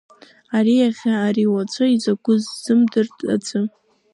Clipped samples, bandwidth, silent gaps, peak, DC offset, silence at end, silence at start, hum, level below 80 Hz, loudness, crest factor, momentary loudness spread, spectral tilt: under 0.1%; 11.5 kHz; none; -6 dBFS; under 0.1%; 0.45 s; 0.5 s; none; -70 dBFS; -19 LUFS; 14 dB; 7 LU; -6 dB/octave